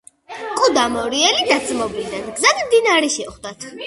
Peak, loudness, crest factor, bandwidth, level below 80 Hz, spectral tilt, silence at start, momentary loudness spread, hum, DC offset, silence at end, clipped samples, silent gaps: 0 dBFS; -17 LUFS; 18 dB; 11.5 kHz; -52 dBFS; -1 dB/octave; 0.3 s; 17 LU; none; under 0.1%; 0 s; under 0.1%; none